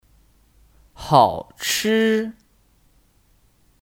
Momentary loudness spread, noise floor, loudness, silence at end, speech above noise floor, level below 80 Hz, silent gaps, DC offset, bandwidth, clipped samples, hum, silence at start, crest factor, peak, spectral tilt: 14 LU; -59 dBFS; -19 LUFS; 1.55 s; 40 dB; -52 dBFS; none; under 0.1%; 18 kHz; under 0.1%; none; 1 s; 22 dB; -2 dBFS; -4 dB/octave